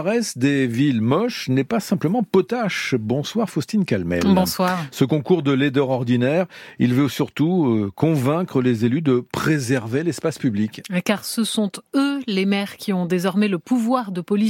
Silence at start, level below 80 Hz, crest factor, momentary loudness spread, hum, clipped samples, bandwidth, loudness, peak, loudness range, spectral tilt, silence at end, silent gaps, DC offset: 0 s; -56 dBFS; 16 dB; 5 LU; none; under 0.1%; 16.5 kHz; -21 LUFS; -4 dBFS; 2 LU; -6 dB/octave; 0 s; none; under 0.1%